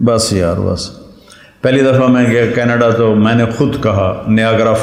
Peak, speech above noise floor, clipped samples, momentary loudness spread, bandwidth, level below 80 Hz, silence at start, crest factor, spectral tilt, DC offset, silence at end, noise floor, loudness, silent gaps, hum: 0 dBFS; 29 dB; under 0.1%; 7 LU; 15.5 kHz; -40 dBFS; 0 s; 12 dB; -6 dB/octave; under 0.1%; 0 s; -41 dBFS; -12 LUFS; none; none